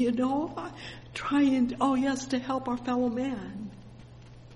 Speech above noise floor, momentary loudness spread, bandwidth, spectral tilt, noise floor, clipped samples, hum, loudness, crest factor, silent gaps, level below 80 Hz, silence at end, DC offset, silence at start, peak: 20 dB; 17 LU; 11 kHz; -5.5 dB/octave; -49 dBFS; under 0.1%; none; -29 LUFS; 16 dB; none; -56 dBFS; 0 s; under 0.1%; 0 s; -14 dBFS